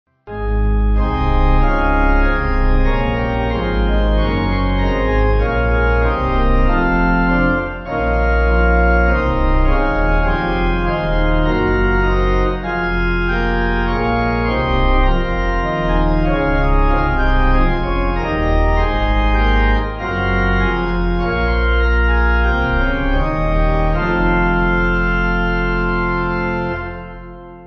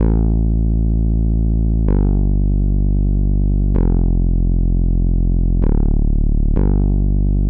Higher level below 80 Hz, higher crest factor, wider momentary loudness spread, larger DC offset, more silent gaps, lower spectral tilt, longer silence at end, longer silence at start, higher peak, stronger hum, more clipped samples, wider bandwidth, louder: about the same, -18 dBFS vs -16 dBFS; about the same, 12 dB vs 8 dB; about the same, 4 LU vs 2 LU; neither; neither; second, -8.5 dB/octave vs -15 dB/octave; about the same, 0 s vs 0 s; first, 0.25 s vs 0 s; first, -2 dBFS vs -6 dBFS; neither; neither; first, 6 kHz vs 1.7 kHz; about the same, -17 LUFS vs -18 LUFS